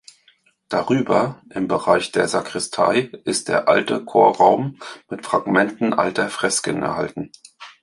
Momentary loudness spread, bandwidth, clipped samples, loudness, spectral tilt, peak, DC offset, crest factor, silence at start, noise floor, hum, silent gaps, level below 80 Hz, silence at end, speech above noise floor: 11 LU; 11.5 kHz; under 0.1%; -19 LUFS; -4 dB/octave; -2 dBFS; under 0.1%; 18 dB; 0.7 s; -59 dBFS; none; none; -58 dBFS; 0.15 s; 39 dB